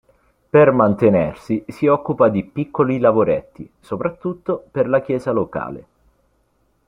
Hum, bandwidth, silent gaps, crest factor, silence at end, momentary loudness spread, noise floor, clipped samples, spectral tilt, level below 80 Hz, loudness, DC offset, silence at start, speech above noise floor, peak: none; 10.5 kHz; none; 16 dB; 1.05 s; 12 LU; -63 dBFS; under 0.1%; -9.5 dB/octave; -52 dBFS; -18 LUFS; under 0.1%; 0.55 s; 46 dB; -2 dBFS